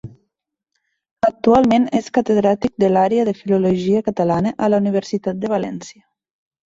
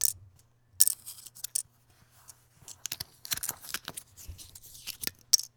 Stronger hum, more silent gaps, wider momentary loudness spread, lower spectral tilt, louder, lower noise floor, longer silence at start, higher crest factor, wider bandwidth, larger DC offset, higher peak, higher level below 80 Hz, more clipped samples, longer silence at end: neither; first, 1.11-1.16 s vs none; second, 8 LU vs 23 LU; first, -7 dB/octave vs 1.5 dB/octave; first, -17 LUFS vs -30 LUFS; first, -79 dBFS vs -63 dBFS; about the same, 0.05 s vs 0 s; second, 16 dB vs 36 dB; second, 7.8 kHz vs over 20 kHz; neither; about the same, -2 dBFS vs 0 dBFS; first, -52 dBFS vs -62 dBFS; neither; first, 0.85 s vs 0.1 s